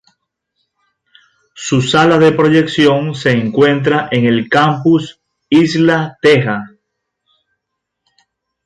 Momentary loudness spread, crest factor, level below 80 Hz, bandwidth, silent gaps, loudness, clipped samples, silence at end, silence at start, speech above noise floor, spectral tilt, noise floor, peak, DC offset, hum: 6 LU; 14 dB; -54 dBFS; 10.5 kHz; none; -12 LUFS; under 0.1%; 2 s; 1.55 s; 64 dB; -6 dB/octave; -76 dBFS; 0 dBFS; under 0.1%; none